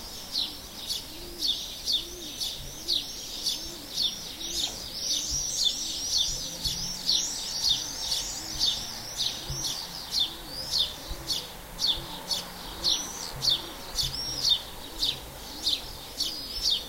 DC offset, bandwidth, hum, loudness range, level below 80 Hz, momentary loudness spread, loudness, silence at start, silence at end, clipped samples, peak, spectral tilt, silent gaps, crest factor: under 0.1%; 16 kHz; none; 3 LU; -48 dBFS; 9 LU; -28 LUFS; 0 s; 0 s; under 0.1%; -12 dBFS; -0.5 dB/octave; none; 20 dB